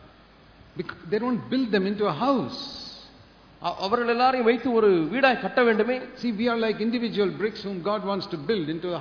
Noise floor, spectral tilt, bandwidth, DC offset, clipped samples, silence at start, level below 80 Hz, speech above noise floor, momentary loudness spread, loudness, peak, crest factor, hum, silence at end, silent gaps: -53 dBFS; -6.5 dB/octave; 5.4 kHz; under 0.1%; under 0.1%; 0.05 s; -60 dBFS; 28 dB; 13 LU; -25 LUFS; -6 dBFS; 18 dB; none; 0 s; none